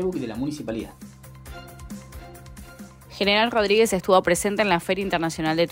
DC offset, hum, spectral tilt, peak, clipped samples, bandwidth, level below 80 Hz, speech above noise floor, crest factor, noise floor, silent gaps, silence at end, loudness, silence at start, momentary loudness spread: under 0.1%; none; -4 dB/octave; -6 dBFS; under 0.1%; 16 kHz; -48 dBFS; 21 dB; 18 dB; -43 dBFS; none; 0 s; -22 LUFS; 0 s; 24 LU